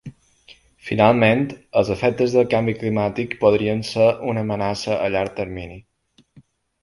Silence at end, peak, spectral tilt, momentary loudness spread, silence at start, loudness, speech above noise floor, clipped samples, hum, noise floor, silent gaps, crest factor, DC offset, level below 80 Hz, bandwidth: 1.05 s; 0 dBFS; -6.5 dB/octave; 10 LU; 0.05 s; -20 LUFS; 34 dB; under 0.1%; none; -53 dBFS; none; 20 dB; under 0.1%; -50 dBFS; 11.5 kHz